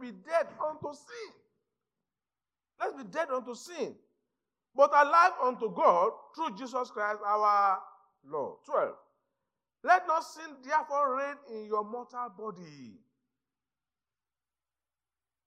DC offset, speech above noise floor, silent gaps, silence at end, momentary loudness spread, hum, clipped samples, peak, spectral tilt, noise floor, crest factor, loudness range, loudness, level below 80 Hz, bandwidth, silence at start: under 0.1%; over 60 dB; none; 2.55 s; 18 LU; none; under 0.1%; -10 dBFS; -4 dB/octave; under -90 dBFS; 24 dB; 13 LU; -30 LUFS; under -90 dBFS; 12 kHz; 0 s